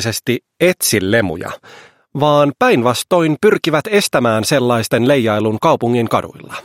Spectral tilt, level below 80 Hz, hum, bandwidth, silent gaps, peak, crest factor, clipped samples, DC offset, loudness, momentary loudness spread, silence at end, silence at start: -4.5 dB/octave; -52 dBFS; none; 16.5 kHz; none; 0 dBFS; 14 dB; under 0.1%; under 0.1%; -14 LUFS; 8 LU; 0.05 s; 0 s